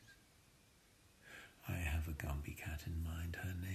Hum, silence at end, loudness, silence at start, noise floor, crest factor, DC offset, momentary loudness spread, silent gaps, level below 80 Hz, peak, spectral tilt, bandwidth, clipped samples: none; 0 s; -45 LUFS; 0 s; -69 dBFS; 18 dB; under 0.1%; 19 LU; none; -50 dBFS; -28 dBFS; -5.5 dB/octave; 14.5 kHz; under 0.1%